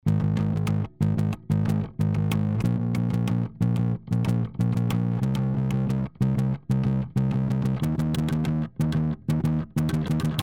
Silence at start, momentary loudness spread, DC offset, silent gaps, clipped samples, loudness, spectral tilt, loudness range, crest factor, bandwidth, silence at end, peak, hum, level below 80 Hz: 0.05 s; 2 LU; under 0.1%; none; under 0.1%; -25 LUFS; -8 dB/octave; 0 LU; 14 dB; 16 kHz; 0 s; -10 dBFS; none; -44 dBFS